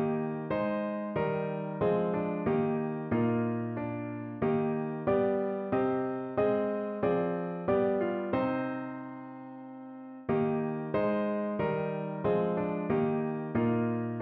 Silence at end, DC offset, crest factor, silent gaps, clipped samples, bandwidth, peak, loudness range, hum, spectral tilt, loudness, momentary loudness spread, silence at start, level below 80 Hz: 0 s; under 0.1%; 14 dB; none; under 0.1%; 4.5 kHz; -16 dBFS; 3 LU; none; -7.5 dB/octave; -31 LUFS; 9 LU; 0 s; -62 dBFS